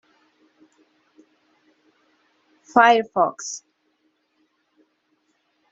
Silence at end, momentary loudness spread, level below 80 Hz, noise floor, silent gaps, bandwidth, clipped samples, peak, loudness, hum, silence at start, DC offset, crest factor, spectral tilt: 2.15 s; 18 LU; -78 dBFS; -69 dBFS; none; 7.8 kHz; under 0.1%; -2 dBFS; -19 LUFS; none; 2.75 s; under 0.1%; 24 dB; -1.5 dB/octave